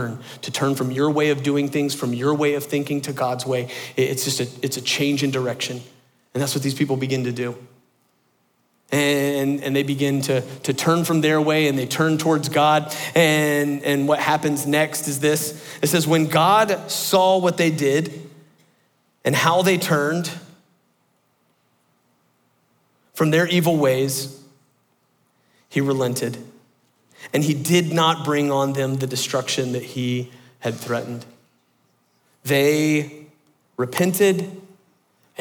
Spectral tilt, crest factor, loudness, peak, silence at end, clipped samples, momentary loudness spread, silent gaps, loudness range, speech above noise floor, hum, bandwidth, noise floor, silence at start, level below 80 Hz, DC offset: -4.5 dB/octave; 18 dB; -20 LUFS; -4 dBFS; 0.75 s; under 0.1%; 11 LU; none; 7 LU; 45 dB; none; 19.5 kHz; -65 dBFS; 0 s; -68 dBFS; under 0.1%